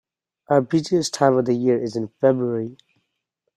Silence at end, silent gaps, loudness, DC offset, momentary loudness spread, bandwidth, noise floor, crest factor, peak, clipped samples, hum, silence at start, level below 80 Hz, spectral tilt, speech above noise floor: 0.85 s; none; -21 LUFS; under 0.1%; 8 LU; 12.5 kHz; -77 dBFS; 20 dB; -2 dBFS; under 0.1%; none; 0.5 s; -64 dBFS; -6 dB/octave; 57 dB